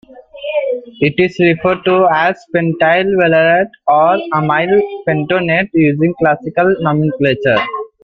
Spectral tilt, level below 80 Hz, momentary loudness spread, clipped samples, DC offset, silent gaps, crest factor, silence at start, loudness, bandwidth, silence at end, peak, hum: -8 dB/octave; -50 dBFS; 6 LU; under 0.1%; under 0.1%; none; 12 dB; 0.1 s; -13 LUFS; 7.2 kHz; 0.2 s; 0 dBFS; none